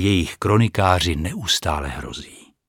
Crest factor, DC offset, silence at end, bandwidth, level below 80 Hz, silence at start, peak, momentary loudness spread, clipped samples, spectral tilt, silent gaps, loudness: 20 dB; under 0.1%; 0.3 s; 17.5 kHz; -36 dBFS; 0 s; 0 dBFS; 14 LU; under 0.1%; -4.5 dB/octave; none; -20 LUFS